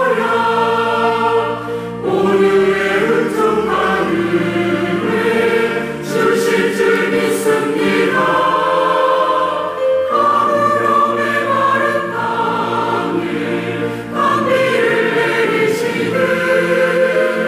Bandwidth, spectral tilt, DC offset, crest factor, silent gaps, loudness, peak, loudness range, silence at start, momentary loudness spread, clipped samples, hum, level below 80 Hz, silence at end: 16 kHz; -5 dB/octave; under 0.1%; 12 dB; none; -15 LUFS; -4 dBFS; 2 LU; 0 s; 5 LU; under 0.1%; none; -54 dBFS; 0 s